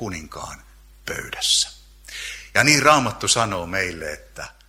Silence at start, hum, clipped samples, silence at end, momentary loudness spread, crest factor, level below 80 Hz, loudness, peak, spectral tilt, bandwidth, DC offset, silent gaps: 0 s; none; under 0.1%; 0.15 s; 21 LU; 22 dB; -46 dBFS; -19 LUFS; 0 dBFS; -2 dB/octave; 16.5 kHz; under 0.1%; none